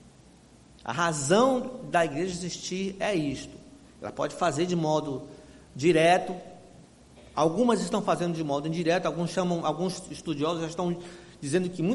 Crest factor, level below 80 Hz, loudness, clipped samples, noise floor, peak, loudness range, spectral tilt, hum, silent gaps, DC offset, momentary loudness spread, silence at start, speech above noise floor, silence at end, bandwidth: 18 dB; -60 dBFS; -27 LUFS; under 0.1%; -54 dBFS; -10 dBFS; 3 LU; -5 dB/octave; none; none; under 0.1%; 16 LU; 0.05 s; 28 dB; 0 s; 11.5 kHz